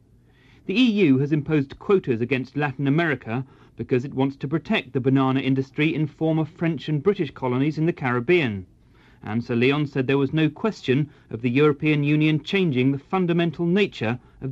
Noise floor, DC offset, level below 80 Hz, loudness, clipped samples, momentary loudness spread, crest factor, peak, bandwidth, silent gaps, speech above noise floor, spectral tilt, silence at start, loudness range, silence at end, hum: -55 dBFS; under 0.1%; -56 dBFS; -23 LUFS; under 0.1%; 8 LU; 16 dB; -8 dBFS; 7.6 kHz; none; 33 dB; -8 dB/octave; 0.7 s; 2 LU; 0 s; none